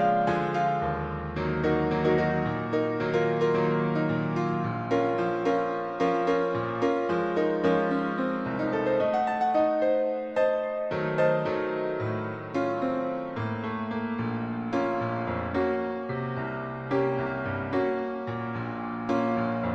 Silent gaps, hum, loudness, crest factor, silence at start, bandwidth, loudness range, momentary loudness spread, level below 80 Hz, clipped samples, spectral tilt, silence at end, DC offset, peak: none; none; -28 LUFS; 16 dB; 0 s; 8 kHz; 4 LU; 7 LU; -52 dBFS; under 0.1%; -8 dB/octave; 0 s; under 0.1%; -12 dBFS